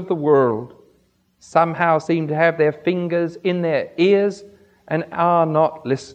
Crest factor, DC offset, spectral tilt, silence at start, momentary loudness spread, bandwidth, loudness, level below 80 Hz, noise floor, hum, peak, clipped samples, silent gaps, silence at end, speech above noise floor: 18 dB; under 0.1%; -7 dB/octave; 0 s; 9 LU; 9 kHz; -19 LUFS; -66 dBFS; -61 dBFS; none; -2 dBFS; under 0.1%; none; 0 s; 42 dB